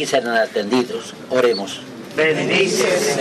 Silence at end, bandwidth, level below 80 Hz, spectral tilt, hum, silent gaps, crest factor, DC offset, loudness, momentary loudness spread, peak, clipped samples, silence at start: 0 s; 13.5 kHz; -64 dBFS; -3.5 dB/octave; none; none; 16 dB; under 0.1%; -18 LUFS; 11 LU; -2 dBFS; under 0.1%; 0 s